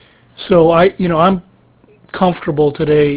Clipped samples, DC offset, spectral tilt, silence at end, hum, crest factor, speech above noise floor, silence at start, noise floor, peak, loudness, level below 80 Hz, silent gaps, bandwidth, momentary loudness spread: under 0.1%; under 0.1%; -11 dB/octave; 0 s; none; 14 dB; 37 dB; 0.4 s; -48 dBFS; 0 dBFS; -13 LUFS; -42 dBFS; none; 4 kHz; 10 LU